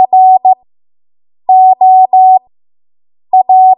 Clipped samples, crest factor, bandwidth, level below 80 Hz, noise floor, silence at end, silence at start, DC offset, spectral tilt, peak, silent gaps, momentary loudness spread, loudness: under 0.1%; 8 dB; 1 kHz; -70 dBFS; under -90 dBFS; 0.05 s; 0 s; under 0.1%; -9 dB/octave; 0 dBFS; none; 7 LU; -7 LUFS